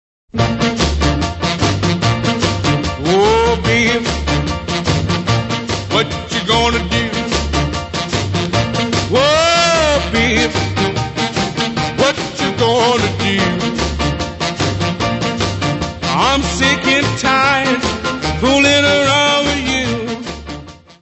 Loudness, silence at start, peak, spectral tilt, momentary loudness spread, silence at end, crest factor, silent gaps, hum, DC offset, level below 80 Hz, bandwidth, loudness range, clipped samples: -15 LUFS; 0.35 s; 0 dBFS; -4.5 dB/octave; 8 LU; 0.1 s; 16 dB; none; none; under 0.1%; -30 dBFS; 8.4 kHz; 4 LU; under 0.1%